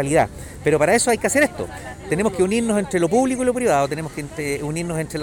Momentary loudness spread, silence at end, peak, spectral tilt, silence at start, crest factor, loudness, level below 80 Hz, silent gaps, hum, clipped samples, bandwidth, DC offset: 11 LU; 0 s; -6 dBFS; -4.5 dB/octave; 0 s; 14 dB; -20 LUFS; -44 dBFS; none; none; under 0.1%; 19 kHz; under 0.1%